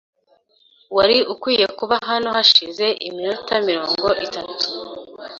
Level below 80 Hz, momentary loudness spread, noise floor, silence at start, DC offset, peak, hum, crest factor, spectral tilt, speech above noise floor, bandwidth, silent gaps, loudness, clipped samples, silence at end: -56 dBFS; 12 LU; -59 dBFS; 0.9 s; under 0.1%; -2 dBFS; none; 20 dB; -3 dB/octave; 41 dB; 7.6 kHz; none; -18 LUFS; under 0.1%; 0 s